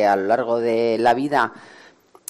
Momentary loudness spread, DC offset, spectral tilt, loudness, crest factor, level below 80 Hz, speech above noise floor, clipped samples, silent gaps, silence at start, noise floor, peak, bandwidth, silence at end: 3 LU; under 0.1%; -5 dB/octave; -20 LUFS; 14 dB; -66 dBFS; 31 dB; under 0.1%; none; 0 s; -50 dBFS; -6 dBFS; 13.5 kHz; 0.7 s